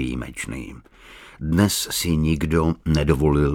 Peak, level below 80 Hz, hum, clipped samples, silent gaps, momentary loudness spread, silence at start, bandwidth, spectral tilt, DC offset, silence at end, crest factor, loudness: -4 dBFS; -32 dBFS; none; under 0.1%; none; 13 LU; 0 s; 18.5 kHz; -5.5 dB/octave; under 0.1%; 0 s; 18 dB; -21 LUFS